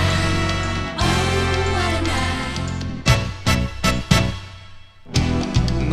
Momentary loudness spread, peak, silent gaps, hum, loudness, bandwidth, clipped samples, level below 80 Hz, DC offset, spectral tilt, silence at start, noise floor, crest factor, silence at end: 6 LU; 0 dBFS; none; none; -20 LUFS; 14.5 kHz; under 0.1%; -28 dBFS; under 0.1%; -5 dB/octave; 0 s; -40 dBFS; 20 dB; 0 s